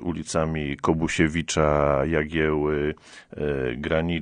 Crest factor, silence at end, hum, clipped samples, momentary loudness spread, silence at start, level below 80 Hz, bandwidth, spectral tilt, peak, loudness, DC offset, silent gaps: 18 dB; 0 s; none; under 0.1%; 7 LU; 0 s; -40 dBFS; 10 kHz; -5.5 dB/octave; -6 dBFS; -24 LUFS; under 0.1%; none